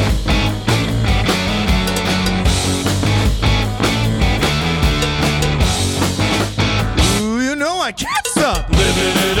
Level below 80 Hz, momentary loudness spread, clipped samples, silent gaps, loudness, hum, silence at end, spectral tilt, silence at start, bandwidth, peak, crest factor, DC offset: -22 dBFS; 2 LU; under 0.1%; none; -16 LUFS; none; 0 s; -4.5 dB/octave; 0 s; 18.5 kHz; -4 dBFS; 12 dB; under 0.1%